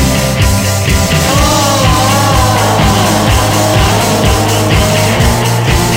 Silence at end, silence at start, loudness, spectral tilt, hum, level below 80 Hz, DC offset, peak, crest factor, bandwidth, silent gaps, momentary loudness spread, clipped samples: 0 s; 0 s; -9 LUFS; -4.5 dB/octave; none; -18 dBFS; under 0.1%; 0 dBFS; 10 dB; 17 kHz; none; 2 LU; 0.2%